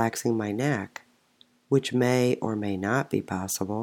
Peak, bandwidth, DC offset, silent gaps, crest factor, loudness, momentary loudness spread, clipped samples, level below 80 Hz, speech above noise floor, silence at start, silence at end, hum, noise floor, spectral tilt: -8 dBFS; 18 kHz; under 0.1%; none; 18 dB; -27 LUFS; 7 LU; under 0.1%; -72 dBFS; 36 dB; 0 s; 0 s; none; -62 dBFS; -5.5 dB/octave